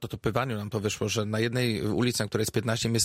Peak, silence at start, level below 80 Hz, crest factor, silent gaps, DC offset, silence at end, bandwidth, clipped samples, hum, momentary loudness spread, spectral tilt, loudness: -12 dBFS; 0 s; -54 dBFS; 16 dB; none; under 0.1%; 0 s; 16 kHz; under 0.1%; none; 4 LU; -4.5 dB/octave; -28 LUFS